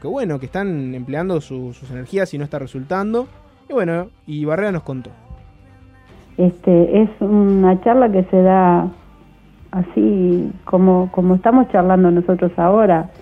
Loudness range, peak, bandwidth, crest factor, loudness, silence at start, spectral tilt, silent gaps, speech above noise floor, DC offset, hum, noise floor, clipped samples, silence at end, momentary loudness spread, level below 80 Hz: 9 LU; -2 dBFS; 6.4 kHz; 14 dB; -16 LUFS; 0.05 s; -9.5 dB/octave; none; 30 dB; under 0.1%; none; -45 dBFS; under 0.1%; 0.1 s; 14 LU; -44 dBFS